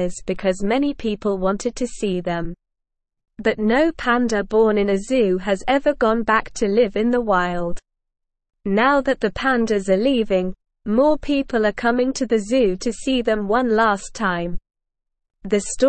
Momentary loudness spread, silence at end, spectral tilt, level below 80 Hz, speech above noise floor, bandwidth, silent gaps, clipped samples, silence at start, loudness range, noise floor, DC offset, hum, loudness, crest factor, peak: 8 LU; 0 s; -5 dB/octave; -40 dBFS; 59 dB; 8.8 kHz; none; under 0.1%; 0 s; 4 LU; -78 dBFS; 0.5%; none; -20 LUFS; 16 dB; -4 dBFS